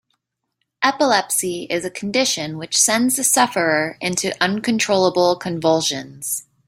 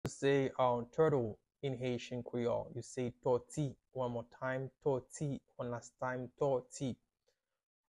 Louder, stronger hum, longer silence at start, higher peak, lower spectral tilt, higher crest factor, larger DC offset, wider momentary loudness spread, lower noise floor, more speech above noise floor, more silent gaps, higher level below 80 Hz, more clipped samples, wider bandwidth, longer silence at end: first, -18 LUFS vs -38 LUFS; neither; first, 0.8 s vs 0.05 s; first, -2 dBFS vs -20 dBFS; second, -2.5 dB/octave vs -6.5 dB/octave; about the same, 18 dB vs 18 dB; neither; about the same, 9 LU vs 11 LU; second, -75 dBFS vs -83 dBFS; first, 56 dB vs 46 dB; neither; first, -62 dBFS vs -68 dBFS; neither; first, 16 kHz vs 11.5 kHz; second, 0.25 s vs 1 s